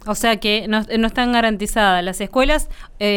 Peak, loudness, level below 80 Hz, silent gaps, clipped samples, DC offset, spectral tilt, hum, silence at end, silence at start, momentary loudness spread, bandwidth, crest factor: -4 dBFS; -18 LUFS; -30 dBFS; none; under 0.1%; under 0.1%; -3.5 dB/octave; none; 0 s; 0 s; 5 LU; 18 kHz; 14 dB